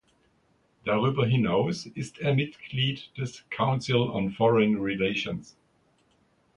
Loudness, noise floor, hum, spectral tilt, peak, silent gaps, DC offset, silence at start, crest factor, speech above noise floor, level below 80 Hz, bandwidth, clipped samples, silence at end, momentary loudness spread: -27 LUFS; -67 dBFS; none; -6.5 dB/octave; -10 dBFS; none; under 0.1%; 0.85 s; 18 dB; 41 dB; -60 dBFS; 10.5 kHz; under 0.1%; 1.15 s; 11 LU